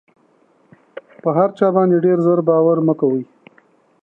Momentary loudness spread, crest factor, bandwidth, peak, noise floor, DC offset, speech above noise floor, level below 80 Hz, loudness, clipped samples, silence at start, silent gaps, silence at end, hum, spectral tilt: 9 LU; 16 dB; 4.1 kHz; -2 dBFS; -56 dBFS; under 0.1%; 42 dB; -72 dBFS; -16 LUFS; under 0.1%; 1.25 s; none; 0.8 s; none; -11 dB/octave